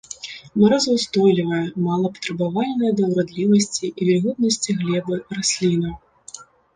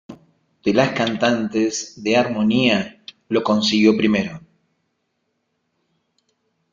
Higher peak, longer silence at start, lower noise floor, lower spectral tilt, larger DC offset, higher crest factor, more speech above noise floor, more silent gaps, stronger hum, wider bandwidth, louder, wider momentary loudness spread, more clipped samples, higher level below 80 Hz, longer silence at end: about the same, -4 dBFS vs -2 dBFS; about the same, 0.1 s vs 0.1 s; second, -42 dBFS vs -72 dBFS; about the same, -5 dB/octave vs -4.5 dB/octave; neither; about the same, 16 dB vs 18 dB; second, 23 dB vs 54 dB; neither; neither; first, 10 kHz vs 7.6 kHz; about the same, -20 LUFS vs -19 LUFS; first, 15 LU vs 10 LU; neither; about the same, -54 dBFS vs -58 dBFS; second, 0.3 s vs 2.35 s